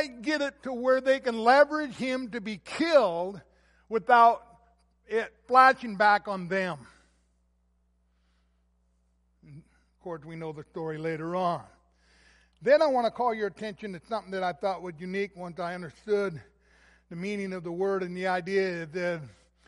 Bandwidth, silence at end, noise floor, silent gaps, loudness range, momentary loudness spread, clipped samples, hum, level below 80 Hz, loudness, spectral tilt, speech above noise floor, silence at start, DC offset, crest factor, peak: 11.5 kHz; 0.4 s; -70 dBFS; none; 12 LU; 17 LU; under 0.1%; none; -66 dBFS; -27 LUFS; -5.5 dB/octave; 43 dB; 0 s; under 0.1%; 22 dB; -6 dBFS